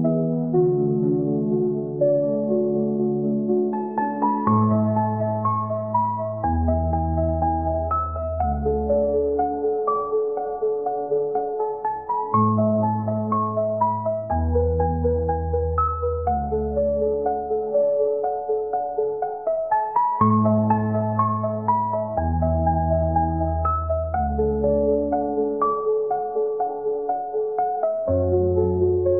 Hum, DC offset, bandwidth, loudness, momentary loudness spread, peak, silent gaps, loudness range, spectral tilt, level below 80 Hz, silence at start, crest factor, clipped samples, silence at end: none; 0.2%; 2.8 kHz; -22 LUFS; 5 LU; -6 dBFS; none; 2 LU; -13 dB/octave; -38 dBFS; 0 s; 16 dB; under 0.1%; 0 s